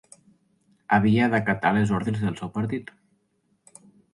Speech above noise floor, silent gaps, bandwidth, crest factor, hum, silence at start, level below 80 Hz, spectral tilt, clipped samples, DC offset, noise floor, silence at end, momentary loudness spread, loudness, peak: 47 dB; none; 11.5 kHz; 20 dB; none; 0.9 s; -54 dBFS; -7 dB/octave; under 0.1%; under 0.1%; -70 dBFS; 1.3 s; 9 LU; -24 LUFS; -6 dBFS